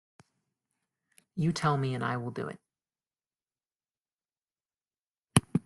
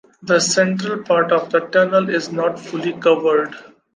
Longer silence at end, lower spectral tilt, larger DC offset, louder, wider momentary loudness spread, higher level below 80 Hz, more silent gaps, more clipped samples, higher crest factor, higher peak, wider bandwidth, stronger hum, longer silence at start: second, 0.05 s vs 0.35 s; first, -5.5 dB/octave vs -4 dB/octave; neither; second, -31 LUFS vs -17 LUFS; first, 13 LU vs 8 LU; about the same, -64 dBFS vs -68 dBFS; first, 4.13-4.17 s, 4.44-4.48 s, 5.00-5.13 s vs none; neither; first, 32 dB vs 16 dB; about the same, -2 dBFS vs -2 dBFS; first, 12 kHz vs 10 kHz; neither; first, 1.35 s vs 0.2 s